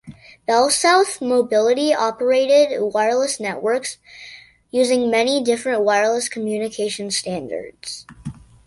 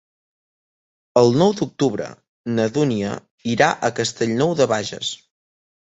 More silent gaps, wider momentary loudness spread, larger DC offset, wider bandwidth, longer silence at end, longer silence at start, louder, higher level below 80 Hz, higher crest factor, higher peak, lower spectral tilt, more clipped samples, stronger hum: second, none vs 2.29-2.44 s, 3.31-3.38 s; first, 17 LU vs 12 LU; neither; first, 11.5 kHz vs 8.4 kHz; second, 0.35 s vs 0.8 s; second, 0.05 s vs 1.15 s; about the same, -18 LUFS vs -20 LUFS; about the same, -58 dBFS vs -58 dBFS; about the same, 18 dB vs 20 dB; about the same, -2 dBFS vs -2 dBFS; second, -2.5 dB/octave vs -5 dB/octave; neither; neither